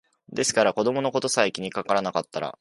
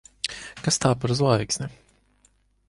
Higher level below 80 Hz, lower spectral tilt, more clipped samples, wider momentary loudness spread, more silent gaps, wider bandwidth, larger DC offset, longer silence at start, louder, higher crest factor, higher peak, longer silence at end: second, -66 dBFS vs -52 dBFS; second, -3 dB/octave vs -4.5 dB/octave; neither; about the same, 9 LU vs 10 LU; neither; about the same, 11.5 kHz vs 11.5 kHz; neither; about the same, 0.3 s vs 0.25 s; about the same, -24 LUFS vs -24 LUFS; about the same, 20 dB vs 20 dB; about the same, -4 dBFS vs -6 dBFS; second, 0.1 s vs 0.95 s